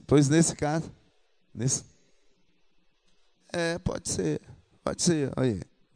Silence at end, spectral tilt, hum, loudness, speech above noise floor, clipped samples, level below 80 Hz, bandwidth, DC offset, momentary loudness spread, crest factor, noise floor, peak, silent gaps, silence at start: 0.3 s; -5 dB/octave; none; -28 LUFS; 42 dB; under 0.1%; -52 dBFS; 10 kHz; under 0.1%; 14 LU; 22 dB; -69 dBFS; -8 dBFS; none; 0.1 s